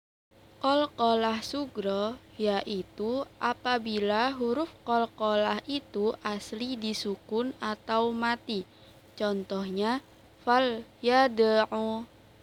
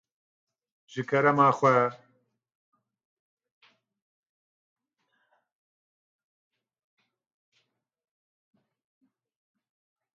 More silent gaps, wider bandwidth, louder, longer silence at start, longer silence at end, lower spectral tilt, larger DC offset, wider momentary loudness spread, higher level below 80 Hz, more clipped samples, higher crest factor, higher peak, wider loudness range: neither; first, 17.5 kHz vs 7.6 kHz; second, -29 LUFS vs -23 LUFS; second, 0.6 s vs 0.95 s; second, 0.35 s vs 8.2 s; second, -5 dB/octave vs -7 dB/octave; neither; second, 10 LU vs 15 LU; first, -64 dBFS vs -82 dBFS; neither; second, 18 dB vs 24 dB; second, -12 dBFS vs -8 dBFS; about the same, 4 LU vs 5 LU